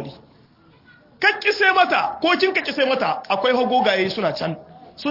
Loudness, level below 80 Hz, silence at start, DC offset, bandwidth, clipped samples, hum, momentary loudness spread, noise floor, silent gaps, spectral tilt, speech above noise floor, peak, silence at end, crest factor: -19 LUFS; -64 dBFS; 0 s; under 0.1%; 5.8 kHz; under 0.1%; none; 11 LU; -53 dBFS; none; -5 dB/octave; 33 dB; -4 dBFS; 0 s; 16 dB